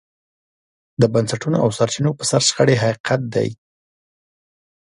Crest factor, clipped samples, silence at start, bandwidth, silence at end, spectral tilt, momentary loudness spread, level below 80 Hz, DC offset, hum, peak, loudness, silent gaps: 20 dB; under 0.1%; 1 s; 11.5 kHz; 1.4 s; -4.5 dB/octave; 7 LU; -56 dBFS; under 0.1%; none; 0 dBFS; -18 LUFS; 3.00-3.04 s